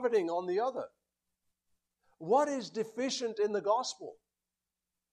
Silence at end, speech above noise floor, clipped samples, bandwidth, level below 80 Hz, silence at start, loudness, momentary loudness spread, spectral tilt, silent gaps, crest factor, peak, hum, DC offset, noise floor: 1 s; over 58 dB; under 0.1%; 11.5 kHz; -84 dBFS; 0 s; -33 LUFS; 17 LU; -3.5 dB/octave; none; 20 dB; -16 dBFS; none; under 0.1%; under -90 dBFS